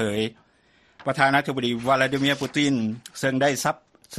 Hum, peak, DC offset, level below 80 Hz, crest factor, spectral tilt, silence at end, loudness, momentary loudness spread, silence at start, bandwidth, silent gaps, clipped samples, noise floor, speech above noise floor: none; -4 dBFS; under 0.1%; -60 dBFS; 20 dB; -4.5 dB/octave; 0 s; -23 LUFS; 10 LU; 0 s; 13 kHz; none; under 0.1%; -60 dBFS; 37 dB